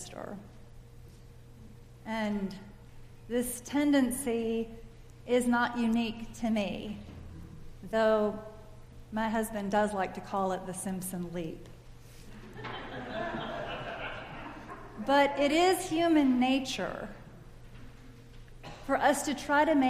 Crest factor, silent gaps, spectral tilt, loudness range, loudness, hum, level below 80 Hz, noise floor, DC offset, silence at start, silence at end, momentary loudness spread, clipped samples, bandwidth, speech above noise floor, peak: 20 dB; none; -4.5 dB/octave; 11 LU; -31 LUFS; none; -52 dBFS; -51 dBFS; under 0.1%; 0 s; 0 s; 23 LU; under 0.1%; 15.5 kHz; 22 dB; -12 dBFS